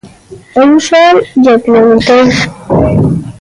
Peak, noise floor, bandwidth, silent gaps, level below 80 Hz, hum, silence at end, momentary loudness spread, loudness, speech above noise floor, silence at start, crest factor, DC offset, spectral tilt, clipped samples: 0 dBFS; -32 dBFS; 11.5 kHz; none; -32 dBFS; none; 0.1 s; 7 LU; -7 LUFS; 26 dB; 0.05 s; 8 dB; under 0.1%; -6 dB/octave; under 0.1%